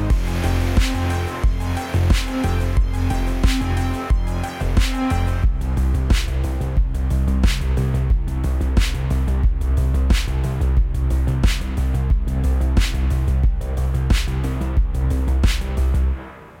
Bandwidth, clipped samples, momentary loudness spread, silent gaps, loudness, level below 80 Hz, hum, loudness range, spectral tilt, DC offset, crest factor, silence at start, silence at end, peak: 16 kHz; under 0.1%; 3 LU; none; -21 LUFS; -20 dBFS; none; 1 LU; -6 dB/octave; under 0.1%; 14 dB; 0 s; 0.05 s; -4 dBFS